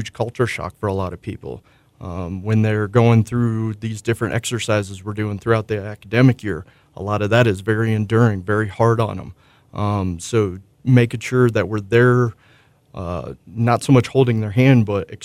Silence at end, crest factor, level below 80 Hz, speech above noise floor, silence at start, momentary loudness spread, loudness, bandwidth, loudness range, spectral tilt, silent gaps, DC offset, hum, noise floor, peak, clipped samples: 0 s; 16 dB; -48 dBFS; 32 dB; 0 s; 15 LU; -19 LUFS; 12 kHz; 2 LU; -7 dB/octave; none; under 0.1%; none; -50 dBFS; -2 dBFS; under 0.1%